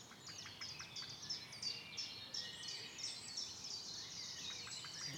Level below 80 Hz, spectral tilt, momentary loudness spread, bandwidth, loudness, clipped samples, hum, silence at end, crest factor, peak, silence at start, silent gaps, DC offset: -78 dBFS; -0.5 dB/octave; 4 LU; 19 kHz; -46 LUFS; under 0.1%; none; 0 s; 16 dB; -32 dBFS; 0 s; none; under 0.1%